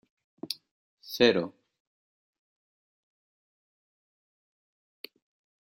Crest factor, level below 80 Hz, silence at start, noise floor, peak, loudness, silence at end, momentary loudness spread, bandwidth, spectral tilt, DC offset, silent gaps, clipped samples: 30 dB; -72 dBFS; 0.45 s; under -90 dBFS; -6 dBFS; -27 LUFS; 4.15 s; 24 LU; 15.5 kHz; -4.5 dB/octave; under 0.1%; 0.71-0.98 s; under 0.1%